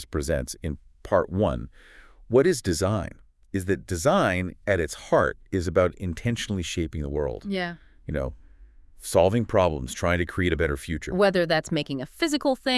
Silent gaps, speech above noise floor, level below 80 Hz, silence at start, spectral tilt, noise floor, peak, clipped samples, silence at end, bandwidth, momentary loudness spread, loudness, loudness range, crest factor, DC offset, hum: none; 25 dB; -42 dBFS; 0 s; -5.5 dB/octave; -50 dBFS; -6 dBFS; under 0.1%; 0 s; 12 kHz; 12 LU; -25 LUFS; 4 LU; 20 dB; under 0.1%; none